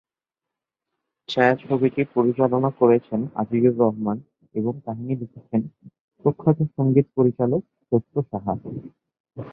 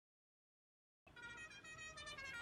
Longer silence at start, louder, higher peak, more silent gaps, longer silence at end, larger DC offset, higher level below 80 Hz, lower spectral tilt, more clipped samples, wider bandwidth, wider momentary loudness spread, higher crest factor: first, 1.3 s vs 1.05 s; first, -22 LUFS vs -53 LUFS; first, -2 dBFS vs -40 dBFS; first, 6.00-6.08 s, 9.20-9.24 s vs none; about the same, 0 s vs 0 s; neither; first, -60 dBFS vs -76 dBFS; first, -9.5 dB/octave vs -1.5 dB/octave; neither; second, 7 kHz vs 15 kHz; first, 12 LU vs 7 LU; about the same, 20 dB vs 16 dB